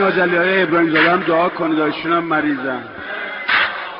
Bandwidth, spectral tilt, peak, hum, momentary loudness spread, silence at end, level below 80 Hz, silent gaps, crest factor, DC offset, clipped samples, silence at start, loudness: 5.6 kHz; -2.5 dB/octave; -2 dBFS; none; 11 LU; 0 s; -58 dBFS; none; 14 dB; under 0.1%; under 0.1%; 0 s; -16 LUFS